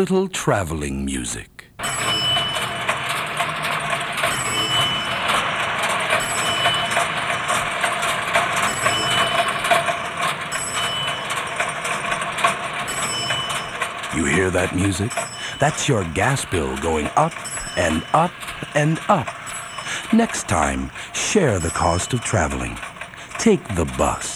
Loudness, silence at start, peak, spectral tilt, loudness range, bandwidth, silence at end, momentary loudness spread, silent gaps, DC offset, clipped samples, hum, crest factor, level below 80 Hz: -21 LUFS; 0 s; -4 dBFS; -3.5 dB/octave; 3 LU; over 20 kHz; 0 s; 7 LU; none; under 0.1%; under 0.1%; none; 18 dB; -40 dBFS